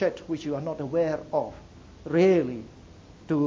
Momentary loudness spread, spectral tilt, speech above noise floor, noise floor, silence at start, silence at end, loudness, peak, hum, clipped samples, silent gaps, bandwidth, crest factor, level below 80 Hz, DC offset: 20 LU; -7.5 dB/octave; 23 dB; -49 dBFS; 0 s; 0 s; -26 LUFS; -10 dBFS; none; under 0.1%; none; 7.4 kHz; 18 dB; -56 dBFS; under 0.1%